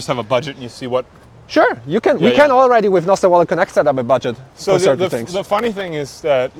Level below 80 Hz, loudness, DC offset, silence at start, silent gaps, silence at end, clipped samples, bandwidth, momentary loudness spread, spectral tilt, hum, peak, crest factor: -52 dBFS; -15 LUFS; under 0.1%; 0 s; none; 0 s; under 0.1%; 16 kHz; 11 LU; -5.5 dB/octave; none; 0 dBFS; 16 dB